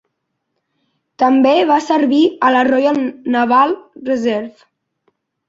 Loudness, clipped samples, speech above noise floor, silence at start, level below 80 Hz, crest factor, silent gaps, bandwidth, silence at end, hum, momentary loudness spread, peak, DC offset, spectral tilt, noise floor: -14 LUFS; under 0.1%; 59 dB; 1.2 s; -62 dBFS; 14 dB; none; 7.8 kHz; 1 s; none; 9 LU; -2 dBFS; under 0.1%; -5 dB/octave; -73 dBFS